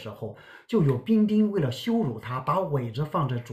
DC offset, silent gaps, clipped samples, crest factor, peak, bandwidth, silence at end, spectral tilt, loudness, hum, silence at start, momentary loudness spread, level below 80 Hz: under 0.1%; none; under 0.1%; 14 dB; -12 dBFS; 13.5 kHz; 0 s; -8 dB/octave; -26 LUFS; none; 0 s; 9 LU; -56 dBFS